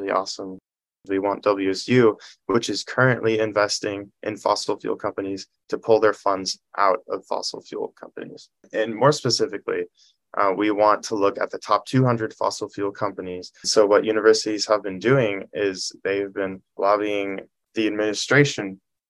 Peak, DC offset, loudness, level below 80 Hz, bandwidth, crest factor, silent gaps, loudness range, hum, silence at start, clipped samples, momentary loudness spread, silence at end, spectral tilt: -2 dBFS; under 0.1%; -22 LUFS; -68 dBFS; 12 kHz; 20 dB; none; 3 LU; none; 0 s; under 0.1%; 14 LU; 0.35 s; -4.5 dB/octave